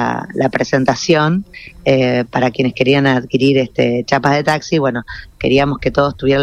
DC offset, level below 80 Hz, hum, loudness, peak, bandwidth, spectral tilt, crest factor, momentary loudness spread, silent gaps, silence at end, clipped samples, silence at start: under 0.1%; -40 dBFS; none; -15 LUFS; 0 dBFS; 11 kHz; -6 dB/octave; 14 dB; 6 LU; none; 0 s; under 0.1%; 0 s